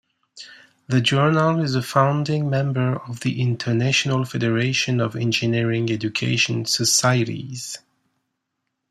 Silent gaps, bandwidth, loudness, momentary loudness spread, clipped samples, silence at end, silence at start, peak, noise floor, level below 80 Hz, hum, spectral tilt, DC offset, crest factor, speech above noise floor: none; 14 kHz; -20 LUFS; 12 LU; under 0.1%; 1.15 s; 0.35 s; -4 dBFS; -78 dBFS; -60 dBFS; none; -4.5 dB/octave; under 0.1%; 18 dB; 57 dB